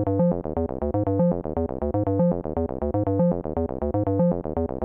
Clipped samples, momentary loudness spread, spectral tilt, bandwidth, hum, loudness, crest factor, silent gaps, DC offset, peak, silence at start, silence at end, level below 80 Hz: under 0.1%; 5 LU; -14.5 dB/octave; 2.6 kHz; none; -25 LUFS; 14 dB; none; under 0.1%; -10 dBFS; 0 s; 0 s; -40 dBFS